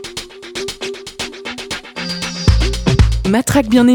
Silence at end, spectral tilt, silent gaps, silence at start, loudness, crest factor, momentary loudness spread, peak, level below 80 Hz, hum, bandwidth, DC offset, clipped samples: 0 s; -5.5 dB/octave; none; 0 s; -17 LUFS; 16 dB; 13 LU; 0 dBFS; -22 dBFS; none; 19 kHz; under 0.1%; under 0.1%